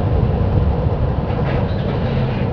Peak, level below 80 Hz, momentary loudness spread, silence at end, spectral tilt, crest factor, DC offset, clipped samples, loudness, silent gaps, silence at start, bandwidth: -2 dBFS; -24 dBFS; 3 LU; 0 s; -10 dB/octave; 16 dB; under 0.1%; under 0.1%; -19 LUFS; none; 0 s; 5.4 kHz